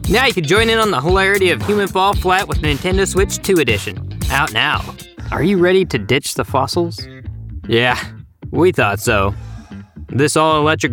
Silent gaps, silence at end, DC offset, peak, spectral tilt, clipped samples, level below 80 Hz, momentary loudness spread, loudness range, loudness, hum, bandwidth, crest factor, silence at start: none; 0 s; under 0.1%; 0 dBFS; -4.5 dB/octave; under 0.1%; -30 dBFS; 18 LU; 3 LU; -15 LUFS; none; 19.5 kHz; 16 dB; 0 s